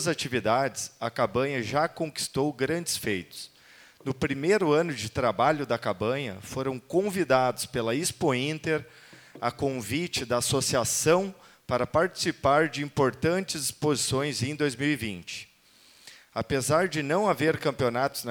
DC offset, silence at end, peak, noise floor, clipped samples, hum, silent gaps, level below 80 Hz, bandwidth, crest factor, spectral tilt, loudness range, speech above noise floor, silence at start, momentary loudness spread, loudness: under 0.1%; 0 s; -6 dBFS; -58 dBFS; under 0.1%; none; none; -58 dBFS; over 20 kHz; 22 dB; -4 dB/octave; 3 LU; 31 dB; 0 s; 9 LU; -27 LUFS